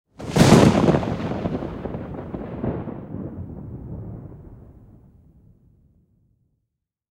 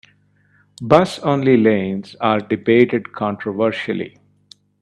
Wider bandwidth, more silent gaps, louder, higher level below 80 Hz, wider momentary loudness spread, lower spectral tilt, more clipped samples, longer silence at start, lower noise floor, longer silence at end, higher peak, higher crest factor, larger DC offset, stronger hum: first, 16.5 kHz vs 11 kHz; neither; second, -21 LUFS vs -17 LUFS; first, -42 dBFS vs -58 dBFS; first, 22 LU vs 11 LU; about the same, -6.5 dB/octave vs -7 dB/octave; neither; second, 0.2 s vs 0.8 s; first, -79 dBFS vs -57 dBFS; first, 2.45 s vs 0.75 s; about the same, 0 dBFS vs 0 dBFS; about the same, 22 dB vs 18 dB; neither; second, none vs 50 Hz at -45 dBFS